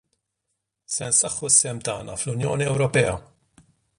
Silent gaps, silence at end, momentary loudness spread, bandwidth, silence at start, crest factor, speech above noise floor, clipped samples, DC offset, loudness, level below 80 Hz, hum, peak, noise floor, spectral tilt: none; 0.8 s; 12 LU; 11.5 kHz; 0.9 s; 22 dB; 56 dB; under 0.1%; under 0.1%; -21 LUFS; -52 dBFS; none; -4 dBFS; -79 dBFS; -3 dB/octave